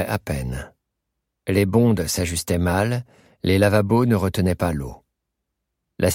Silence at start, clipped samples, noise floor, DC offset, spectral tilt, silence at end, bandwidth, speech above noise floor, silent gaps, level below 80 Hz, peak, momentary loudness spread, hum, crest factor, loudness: 0 s; under 0.1%; -79 dBFS; under 0.1%; -6 dB/octave; 0 s; 16.5 kHz; 59 dB; none; -40 dBFS; -4 dBFS; 12 LU; none; 18 dB; -21 LUFS